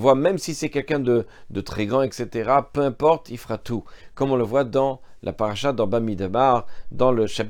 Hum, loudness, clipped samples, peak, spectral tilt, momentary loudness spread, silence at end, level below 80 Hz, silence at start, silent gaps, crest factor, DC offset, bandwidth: none; -23 LUFS; under 0.1%; -2 dBFS; -6 dB/octave; 12 LU; 0 s; -48 dBFS; 0 s; none; 20 dB; under 0.1%; 17 kHz